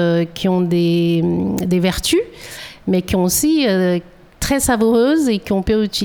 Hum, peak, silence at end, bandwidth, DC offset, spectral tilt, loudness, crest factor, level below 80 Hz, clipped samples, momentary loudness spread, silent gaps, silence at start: none; -2 dBFS; 0 s; over 20 kHz; under 0.1%; -5 dB/octave; -16 LUFS; 14 dB; -38 dBFS; under 0.1%; 7 LU; none; 0 s